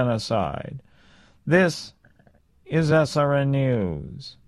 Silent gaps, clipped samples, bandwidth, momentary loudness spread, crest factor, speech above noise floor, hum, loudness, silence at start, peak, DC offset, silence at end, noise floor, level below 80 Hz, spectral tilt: none; under 0.1%; 12 kHz; 18 LU; 20 dB; 35 dB; none; -22 LUFS; 0 s; -4 dBFS; under 0.1%; 0.15 s; -58 dBFS; -50 dBFS; -6.5 dB/octave